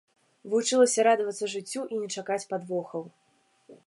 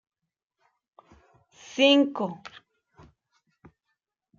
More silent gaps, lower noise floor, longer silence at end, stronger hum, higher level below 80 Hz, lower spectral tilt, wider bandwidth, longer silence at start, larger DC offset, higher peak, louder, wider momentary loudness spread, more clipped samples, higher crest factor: neither; second, -62 dBFS vs -82 dBFS; second, 0.1 s vs 2 s; neither; second, -84 dBFS vs -72 dBFS; about the same, -3 dB/octave vs -4 dB/octave; first, 11.5 kHz vs 7.4 kHz; second, 0.45 s vs 1.7 s; neither; about the same, -10 dBFS vs -8 dBFS; second, -27 LUFS vs -23 LUFS; second, 13 LU vs 24 LU; neither; about the same, 18 dB vs 22 dB